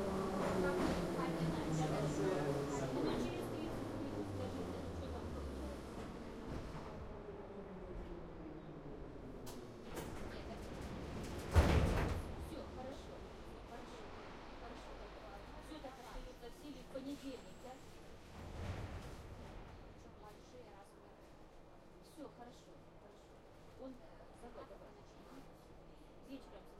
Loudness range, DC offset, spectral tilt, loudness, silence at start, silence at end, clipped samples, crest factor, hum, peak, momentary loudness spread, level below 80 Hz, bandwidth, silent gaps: 17 LU; under 0.1%; -6.5 dB/octave; -44 LUFS; 0 s; 0 s; under 0.1%; 26 dB; none; -18 dBFS; 21 LU; -52 dBFS; 16 kHz; none